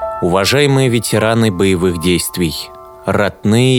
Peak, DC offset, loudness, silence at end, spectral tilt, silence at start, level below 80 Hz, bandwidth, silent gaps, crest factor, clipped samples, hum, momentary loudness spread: 0 dBFS; under 0.1%; -14 LUFS; 0 s; -5 dB/octave; 0 s; -40 dBFS; 19.5 kHz; none; 14 dB; under 0.1%; none; 8 LU